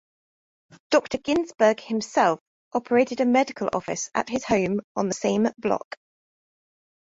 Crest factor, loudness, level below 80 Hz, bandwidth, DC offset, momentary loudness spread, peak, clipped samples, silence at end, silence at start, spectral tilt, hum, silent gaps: 18 dB; -24 LUFS; -60 dBFS; 8 kHz; under 0.1%; 8 LU; -6 dBFS; under 0.1%; 1.25 s; 0.9 s; -4.5 dB/octave; none; 2.41-2.71 s, 4.84-4.95 s